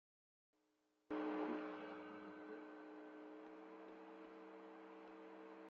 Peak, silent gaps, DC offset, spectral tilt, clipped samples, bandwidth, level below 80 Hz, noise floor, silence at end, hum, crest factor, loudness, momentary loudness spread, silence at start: -34 dBFS; none; under 0.1%; -4 dB/octave; under 0.1%; 7 kHz; under -90 dBFS; -84 dBFS; 0 s; none; 20 dB; -52 LUFS; 13 LU; 1.1 s